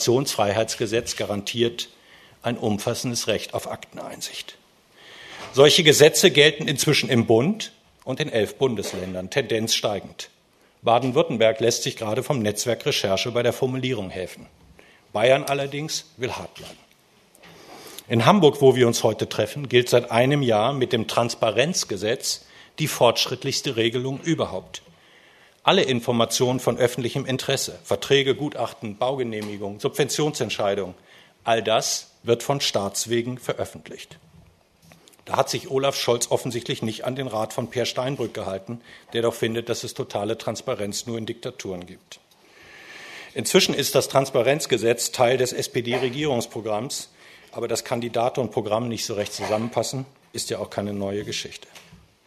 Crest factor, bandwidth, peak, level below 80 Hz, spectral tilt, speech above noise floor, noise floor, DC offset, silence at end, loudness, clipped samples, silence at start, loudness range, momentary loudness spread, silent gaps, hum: 24 dB; 13.5 kHz; 0 dBFS; -62 dBFS; -4 dB/octave; 35 dB; -58 dBFS; under 0.1%; 0.3 s; -22 LUFS; under 0.1%; 0 s; 8 LU; 15 LU; none; none